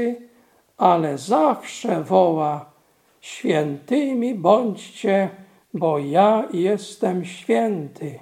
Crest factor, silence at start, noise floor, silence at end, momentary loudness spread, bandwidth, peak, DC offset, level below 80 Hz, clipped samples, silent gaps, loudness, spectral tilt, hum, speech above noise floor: 20 dB; 0 s; -60 dBFS; 0.05 s; 10 LU; 15.5 kHz; -2 dBFS; under 0.1%; -74 dBFS; under 0.1%; none; -21 LUFS; -6.5 dB/octave; none; 39 dB